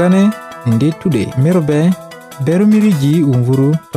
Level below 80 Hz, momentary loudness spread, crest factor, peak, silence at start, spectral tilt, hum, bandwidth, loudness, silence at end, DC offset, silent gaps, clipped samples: -48 dBFS; 8 LU; 10 dB; -2 dBFS; 0 s; -8 dB/octave; none; 15.5 kHz; -13 LUFS; 0 s; under 0.1%; none; under 0.1%